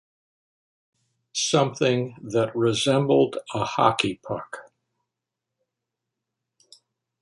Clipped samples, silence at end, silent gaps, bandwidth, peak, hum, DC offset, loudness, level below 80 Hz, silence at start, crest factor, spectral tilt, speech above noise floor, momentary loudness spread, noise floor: under 0.1%; 2.6 s; none; 11.5 kHz; -4 dBFS; none; under 0.1%; -23 LUFS; -64 dBFS; 1.35 s; 22 dB; -4.5 dB/octave; 62 dB; 12 LU; -85 dBFS